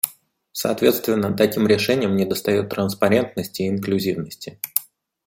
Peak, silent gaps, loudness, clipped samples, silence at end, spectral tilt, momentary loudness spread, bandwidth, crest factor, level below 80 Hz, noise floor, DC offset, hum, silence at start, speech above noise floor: 0 dBFS; none; -21 LUFS; under 0.1%; 0.45 s; -5 dB/octave; 8 LU; 17 kHz; 22 dB; -60 dBFS; -47 dBFS; under 0.1%; none; 0.05 s; 27 dB